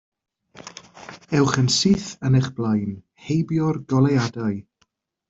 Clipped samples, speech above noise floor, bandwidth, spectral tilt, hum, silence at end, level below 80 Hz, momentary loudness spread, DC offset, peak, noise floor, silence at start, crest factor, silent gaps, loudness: under 0.1%; 48 dB; 8 kHz; -5.5 dB/octave; none; 0.7 s; -54 dBFS; 22 LU; under 0.1%; -4 dBFS; -68 dBFS; 0.65 s; 18 dB; none; -21 LUFS